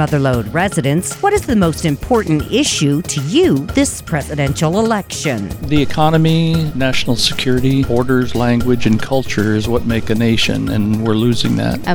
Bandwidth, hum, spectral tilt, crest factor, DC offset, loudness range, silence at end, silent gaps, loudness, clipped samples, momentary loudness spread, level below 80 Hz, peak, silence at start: 19 kHz; none; -5.5 dB/octave; 14 dB; under 0.1%; 1 LU; 0 s; none; -15 LUFS; under 0.1%; 4 LU; -32 dBFS; 0 dBFS; 0 s